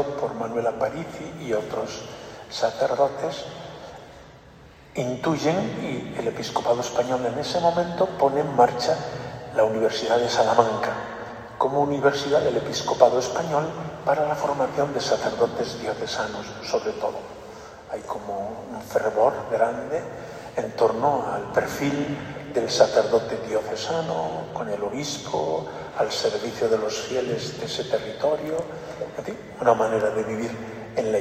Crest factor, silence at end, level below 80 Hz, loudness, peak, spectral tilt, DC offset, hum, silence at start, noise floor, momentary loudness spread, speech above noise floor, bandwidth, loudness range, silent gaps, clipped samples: 24 dB; 0 s; -56 dBFS; -25 LUFS; 0 dBFS; -4.5 dB/octave; under 0.1%; none; 0 s; -48 dBFS; 14 LU; 24 dB; 15 kHz; 6 LU; none; under 0.1%